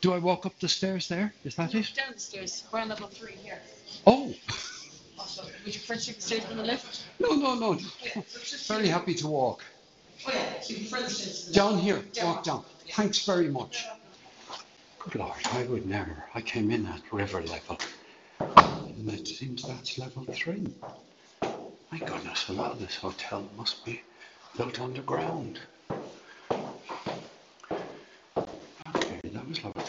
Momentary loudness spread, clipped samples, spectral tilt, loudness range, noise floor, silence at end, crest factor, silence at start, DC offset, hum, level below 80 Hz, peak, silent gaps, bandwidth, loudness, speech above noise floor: 17 LU; under 0.1%; -4.5 dB/octave; 9 LU; -53 dBFS; 0 s; 30 dB; 0 s; under 0.1%; none; -60 dBFS; 0 dBFS; none; 8.2 kHz; -30 LUFS; 23 dB